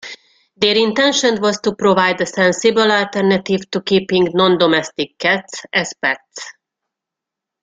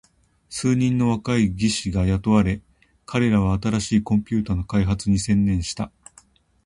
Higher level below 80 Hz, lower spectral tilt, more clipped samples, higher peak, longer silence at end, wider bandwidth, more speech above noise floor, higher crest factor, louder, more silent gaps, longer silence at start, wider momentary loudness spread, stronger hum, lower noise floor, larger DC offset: second, -58 dBFS vs -38 dBFS; second, -4 dB/octave vs -6 dB/octave; neither; first, 0 dBFS vs -4 dBFS; first, 1.1 s vs 0.75 s; second, 9.4 kHz vs 11.5 kHz; first, 68 dB vs 35 dB; about the same, 16 dB vs 18 dB; first, -15 LUFS vs -22 LUFS; neither; second, 0.05 s vs 0.5 s; about the same, 7 LU vs 8 LU; neither; first, -84 dBFS vs -55 dBFS; neither